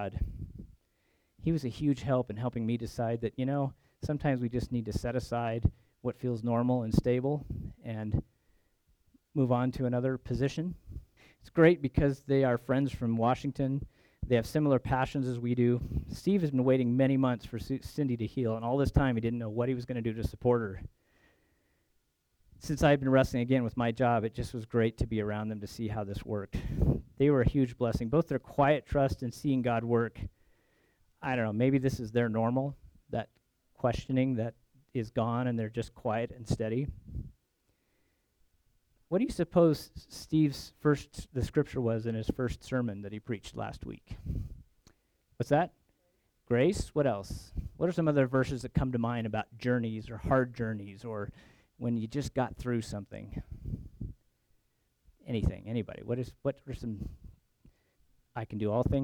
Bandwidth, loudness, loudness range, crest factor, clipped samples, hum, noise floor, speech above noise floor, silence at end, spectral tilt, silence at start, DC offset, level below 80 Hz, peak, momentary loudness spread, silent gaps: 16.5 kHz; -32 LUFS; 8 LU; 22 dB; under 0.1%; none; -76 dBFS; 45 dB; 0 s; -7.5 dB/octave; 0 s; under 0.1%; -46 dBFS; -10 dBFS; 13 LU; none